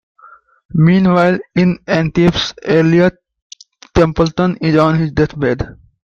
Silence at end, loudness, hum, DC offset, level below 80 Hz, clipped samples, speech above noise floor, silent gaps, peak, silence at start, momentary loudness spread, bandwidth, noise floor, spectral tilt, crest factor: 0.35 s; -14 LUFS; none; under 0.1%; -36 dBFS; under 0.1%; 32 dB; 3.42-3.50 s; -2 dBFS; 0.75 s; 7 LU; 7.2 kHz; -44 dBFS; -7 dB/octave; 14 dB